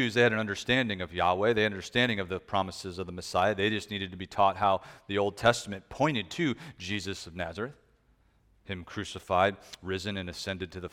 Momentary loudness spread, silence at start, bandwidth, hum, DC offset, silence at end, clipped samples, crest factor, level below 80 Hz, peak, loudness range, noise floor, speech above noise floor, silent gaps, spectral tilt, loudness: 12 LU; 0 s; 16 kHz; none; under 0.1%; 0.05 s; under 0.1%; 22 dB; -58 dBFS; -8 dBFS; 6 LU; -66 dBFS; 36 dB; none; -4.5 dB/octave; -30 LUFS